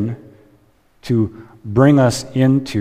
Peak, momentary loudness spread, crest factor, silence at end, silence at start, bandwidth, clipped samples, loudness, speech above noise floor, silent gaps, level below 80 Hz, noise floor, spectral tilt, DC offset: 0 dBFS; 22 LU; 16 dB; 0 s; 0 s; 15 kHz; under 0.1%; -16 LUFS; 39 dB; none; -48 dBFS; -54 dBFS; -7 dB/octave; under 0.1%